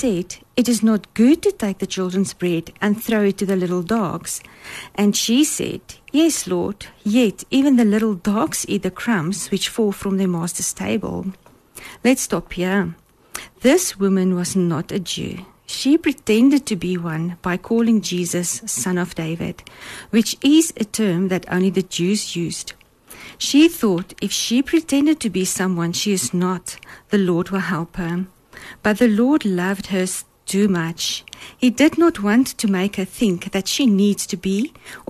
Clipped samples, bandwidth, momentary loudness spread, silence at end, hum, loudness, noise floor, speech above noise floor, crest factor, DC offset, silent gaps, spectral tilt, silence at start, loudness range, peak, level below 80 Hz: under 0.1%; 13.5 kHz; 12 LU; 0.1 s; none; -19 LUFS; -43 dBFS; 24 dB; 16 dB; under 0.1%; none; -4.5 dB/octave; 0 s; 3 LU; -4 dBFS; -50 dBFS